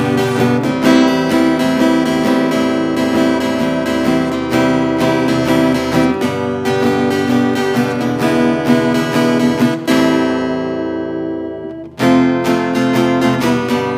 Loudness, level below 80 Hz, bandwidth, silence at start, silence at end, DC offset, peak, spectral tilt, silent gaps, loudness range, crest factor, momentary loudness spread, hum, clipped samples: -14 LUFS; -44 dBFS; 15.5 kHz; 0 s; 0 s; under 0.1%; 0 dBFS; -6 dB/octave; none; 2 LU; 14 dB; 5 LU; none; under 0.1%